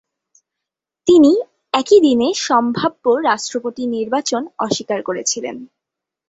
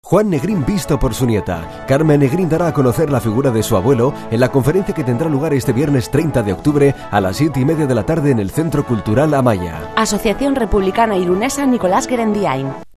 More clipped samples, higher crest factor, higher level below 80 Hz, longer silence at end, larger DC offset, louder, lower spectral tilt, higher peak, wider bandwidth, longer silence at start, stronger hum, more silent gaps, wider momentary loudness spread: neither; about the same, 16 dB vs 14 dB; second, -58 dBFS vs -34 dBFS; first, 0.65 s vs 0.1 s; neither; about the same, -16 LUFS vs -16 LUFS; second, -3.5 dB/octave vs -6.5 dB/octave; about the same, -2 dBFS vs 0 dBFS; second, 8 kHz vs 14 kHz; first, 1.05 s vs 0.05 s; neither; neither; first, 11 LU vs 4 LU